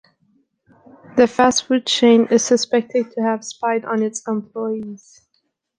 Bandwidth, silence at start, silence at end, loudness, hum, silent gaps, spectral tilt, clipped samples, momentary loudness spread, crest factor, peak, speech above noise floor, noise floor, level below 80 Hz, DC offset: 10 kHz; 1.15 s; 0.85 s; -18 LUFS; none; none; -3.5 dB/octave; under 0.1%; 12 LU; 18 dB; -2 dBFS; 51 dB; -69 dBFS; -62 dBFS; under 0.1%